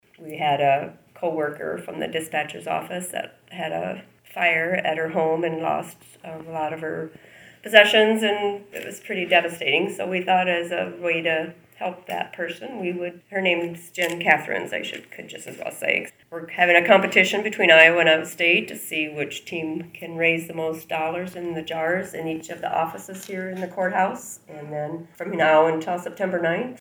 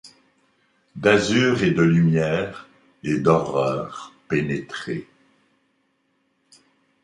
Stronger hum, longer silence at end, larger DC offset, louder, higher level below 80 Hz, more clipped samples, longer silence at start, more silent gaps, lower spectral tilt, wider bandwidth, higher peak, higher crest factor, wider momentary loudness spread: neither; second, 0.05 s vs 2 s; neither; about the same, -22 LUFS vs -21 LUFS; second, -70 dBFS vs -54 dBFS; neither; first, 0.2 s vs 0.05 s; neither; second, -4 dB/octave vs -6 dB/octave; first, over 20 kHz vs 10.5 kHz; about the same, 0 dBFS vs -2 dBFS; about the same, 24 dB vs 20 dB; about the same, 17 LU vs 16 LU